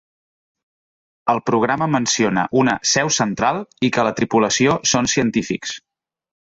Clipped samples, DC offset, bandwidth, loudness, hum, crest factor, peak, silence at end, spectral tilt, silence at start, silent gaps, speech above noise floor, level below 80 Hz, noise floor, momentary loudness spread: under 0.1%; under 0.1%; 8 kHz; -18 LUFS; none; 16 dB; -4 dBFS; 0.75 s; -3.5 dB/octave; 1.25 s; none; over 72 dB; -52 dBFS; under -90 dBFS; 7 LU